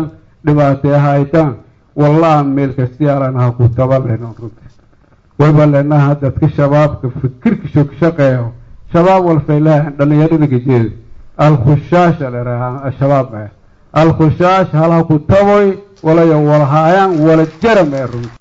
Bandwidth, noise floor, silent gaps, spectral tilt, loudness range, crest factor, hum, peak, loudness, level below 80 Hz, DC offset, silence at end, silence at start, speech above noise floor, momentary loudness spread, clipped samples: 7.4 kHz; -47 dBFS; none; -9 dB/octave; 3 LU; 10 dB; none; 0 dBFS; -11 LUFS; -38 dBFS; under 0.1%; 0.1 s; 0 s; 37 dB; 10 LU; under 0.1%